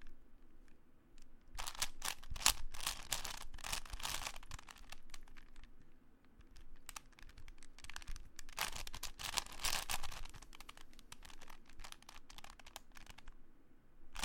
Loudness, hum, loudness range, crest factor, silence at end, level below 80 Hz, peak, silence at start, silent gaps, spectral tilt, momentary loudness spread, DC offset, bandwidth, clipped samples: -43 LUFS; none; 17 LU; 34 dB; 0 s; -52 dBFS; -10 dBFS; 0 s; none; 0 dB/octave; 21 LU; under 0.1%; 17 kHz; under 0.1%